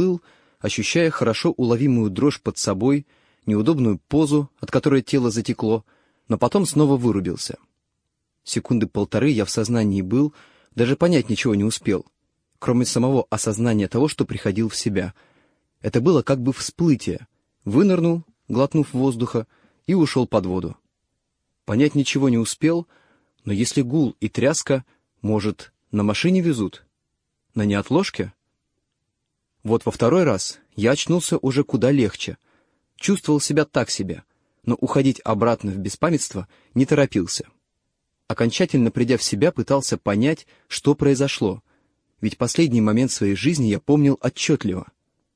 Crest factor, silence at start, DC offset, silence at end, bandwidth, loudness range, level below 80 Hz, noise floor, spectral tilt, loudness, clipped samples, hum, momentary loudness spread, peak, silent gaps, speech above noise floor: 18 dB; 0 s; under 0.1%; 0.55 s; 10.5 kHz; 3 LU; -54 dBFS; -77 dBFS; -5.5 dB/octave; -21 LUFS; under 0.1%; none; 10 LU; -4 dBFS; none; 57 dB